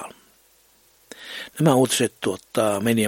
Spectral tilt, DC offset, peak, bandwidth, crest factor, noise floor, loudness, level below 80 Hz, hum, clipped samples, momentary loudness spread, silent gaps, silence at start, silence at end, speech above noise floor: -4.5 dB/octave; under 0.1%; -4 dBFS; 17 kHz; 20 dB; -58 dBFS; -21 LUFS; -64 dBFS; none; under 0.1%; 18 LU; none; 0 s; 0 s; 38 dB